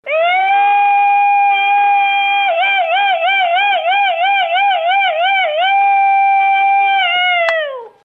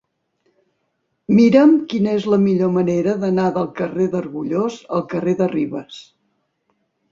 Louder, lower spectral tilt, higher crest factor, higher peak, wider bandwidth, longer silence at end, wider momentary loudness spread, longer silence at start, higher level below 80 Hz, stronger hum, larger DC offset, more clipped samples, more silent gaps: first, -12 LUFS vs -18 LUFS; second, -0.5 dB/octave vs -8 dB/octave; second, 12 dB vs 18 dB; about the same, 0 dBFS vs -2 dBFS; second, 5.4 kHz vs 7.6 kHz; second, 0.15 s vs 1.1 s; second, 2 LU vs 12 LU; second, 0.05 s vs 1.3 s; second, -70 dBFS vs -60 dBFS; neither; neither; neither; neither